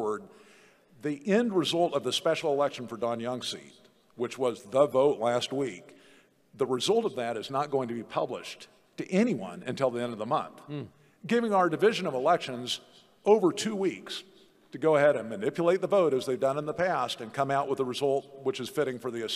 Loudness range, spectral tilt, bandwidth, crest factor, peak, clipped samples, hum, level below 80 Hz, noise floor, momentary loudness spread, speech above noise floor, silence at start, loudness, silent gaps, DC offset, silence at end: 4 LU; -5 dB/octave; 14.5 kHz; 20 dB; -10 dBFS; under 0.1%; none; -78 dBFS; -60 dBFS; 14 LU; 32 dB; 0 s; -29 LUFS; none; under 0.1%; 0 s